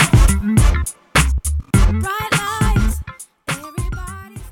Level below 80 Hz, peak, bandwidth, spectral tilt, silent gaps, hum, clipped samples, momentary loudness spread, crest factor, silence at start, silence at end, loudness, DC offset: -20 dBFS; 0 dBFS; 17.5 kHz; -4.5 dB/octave; none; none; under 0.1%; 14 LU; 16 dB; 0 s; 0 s; -18 LUFS; under 0.1%